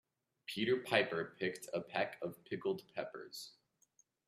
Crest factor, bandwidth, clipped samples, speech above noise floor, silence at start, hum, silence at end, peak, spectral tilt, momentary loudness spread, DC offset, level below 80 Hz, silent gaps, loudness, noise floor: 26 dB; 15.5 kHz; under 0.1%; 36 dB; 0.5 s; none; 0.75 s; -16 dBFS; -4.5 dB/octave; 15 LU; under 0.1%; -82 dBFS; none; -39 LUFS; -75 dBFS